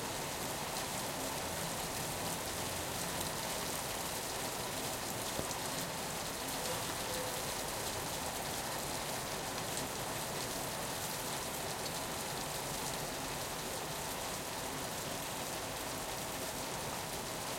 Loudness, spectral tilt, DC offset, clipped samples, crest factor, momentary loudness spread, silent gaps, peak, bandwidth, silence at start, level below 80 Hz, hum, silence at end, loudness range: -38 LUFS; -2.5 dB/octave; under 0.1%; under 0.1%; 20 dB; 2 LU; none; -20 dBFS; 16.5 kHz; 0 s; -58 dBFS; none; 0 s; 2 LU